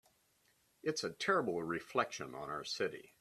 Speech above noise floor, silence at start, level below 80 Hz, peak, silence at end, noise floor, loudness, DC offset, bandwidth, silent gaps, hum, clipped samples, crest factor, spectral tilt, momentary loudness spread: 36 dB; 0.85 s; -76 dBFS; -18 dBFS; 0.15 s; -74 dBFS; -38 LUFS; under 0.1%; 14 kHz; none; none; under 0.1%; 22 dB; -3.5 dB/octave; 9 LU